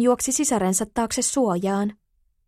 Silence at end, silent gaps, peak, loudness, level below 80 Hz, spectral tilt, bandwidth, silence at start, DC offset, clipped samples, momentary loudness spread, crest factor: 0.55 s; none; -8 dBFS; -22 LUFS; -52 dBFS; -4 dB/octave; 16 kHz; 0 s; under 0.1%; under 0.1%; 5 LU; 16 dB